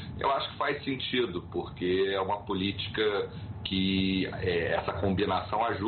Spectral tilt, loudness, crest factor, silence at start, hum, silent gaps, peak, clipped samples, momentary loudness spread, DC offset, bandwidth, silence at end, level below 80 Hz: -3.5 dB/octave; -30 LUFS; 14 dB; 0 s; none; none; -16 dBFS; under 0.1%; 5 LU; under 0.1%; 4.6 kHz; 0 s; -52 dBFS